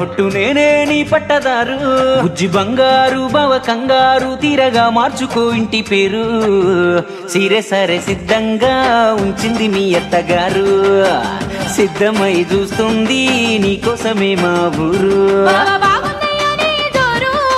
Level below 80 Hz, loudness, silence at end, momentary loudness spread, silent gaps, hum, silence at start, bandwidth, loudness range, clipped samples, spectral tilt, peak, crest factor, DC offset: -40 dBFS; -13 LUFS; 0 s; 5 LU; none; none; 0 s; 14 kHz; 1 LU; under 0.1%; -4.5 dB/octave; 0 dBFS; 12 dB; under 0.1%